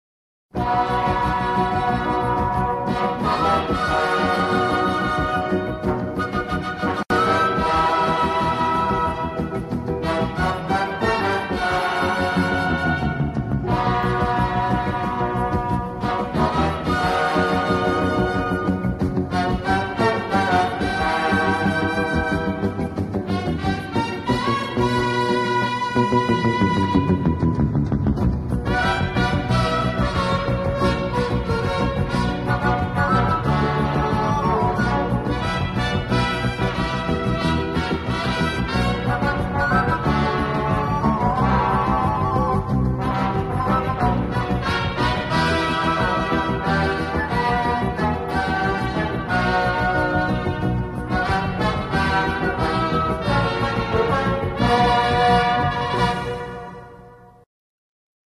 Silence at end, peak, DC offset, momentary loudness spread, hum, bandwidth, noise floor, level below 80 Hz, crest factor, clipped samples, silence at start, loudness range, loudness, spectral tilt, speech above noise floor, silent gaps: 1 s; -6 dBFS; under 0.1%; 5 LU; none; 13 kHz; -45 dBFS; -34 dBFS; 16 dB; under 0.1%; 0.55 s; 2 LU; -21 LUFS; -6.5 dB/octave; 26 dB; none